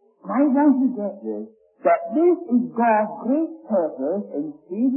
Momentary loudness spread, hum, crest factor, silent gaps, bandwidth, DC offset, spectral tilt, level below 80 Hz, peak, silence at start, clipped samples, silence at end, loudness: 13 LU; none; 14 dB; none; 3 kHz; under 0.1%; -13 dB/octave; -76 dBFS; -6 dBFS; 0.25 s; under 0.1%; 0 s; -22 LUFS